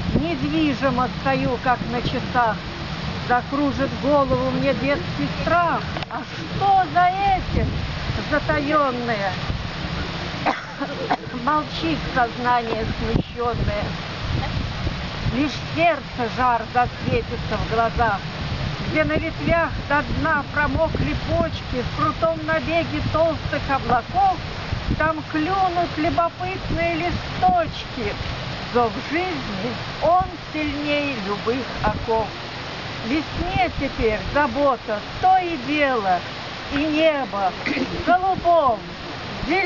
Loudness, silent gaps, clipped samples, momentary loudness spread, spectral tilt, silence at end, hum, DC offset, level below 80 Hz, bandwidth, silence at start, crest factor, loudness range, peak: -22 LUFS; none; under 0.1%; 8 LU; -6 dB/octave; 0 s; none; 0.2%; -36 dBFS; 6 kHz; 0 s; 16 dB; 3 LU; -6 dBFS